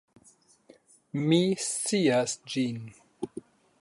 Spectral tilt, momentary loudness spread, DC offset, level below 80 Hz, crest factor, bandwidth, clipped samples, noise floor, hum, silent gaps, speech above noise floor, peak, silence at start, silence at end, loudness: -4.5 dB/octave; 17 LU; under 0.1%; -72 dBFS; 20 dB; 11.5 kHz; under 0.1%; -61 dBFS; none; none; 34 dB; -10 dBFS; 1.15 s; 0.4 s; -27 LUFS